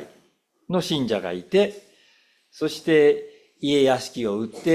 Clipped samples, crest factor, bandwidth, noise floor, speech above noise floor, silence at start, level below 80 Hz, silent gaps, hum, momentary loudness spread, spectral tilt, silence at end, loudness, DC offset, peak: under 0.1%; 16 dB; 14.5 kHz; -64 dBFS; 43 dB; 0 s; -64 dBFS; none; none; 10 LU; -5.5 dB/octave; 0 s; -23 LUFS; under 0.1%; -6 dBFS